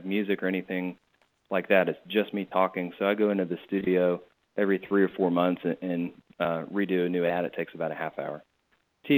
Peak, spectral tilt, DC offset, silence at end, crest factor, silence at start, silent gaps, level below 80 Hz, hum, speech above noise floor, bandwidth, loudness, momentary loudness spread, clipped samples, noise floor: -8 dBFS; -9.5 dB/octave; under 0.1%; 0 s; 20 dB; 0 s; none; -72 dBFS; none; 44 dB; 19 kHz; -28 LUFS; 9 LU; under 0.1%; -71 dBFS